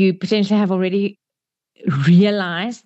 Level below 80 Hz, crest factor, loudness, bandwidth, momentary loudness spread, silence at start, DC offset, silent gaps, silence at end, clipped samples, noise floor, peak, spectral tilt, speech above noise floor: -68 dBFS; 12 dB; -17 LUFS; 8 kHz; 10 LU; 0 s; under 0.1%; none; 0.1 s; under 0.1%; -86 dBFS; -4 dBFS; -7.5 dB/octave; 69 dB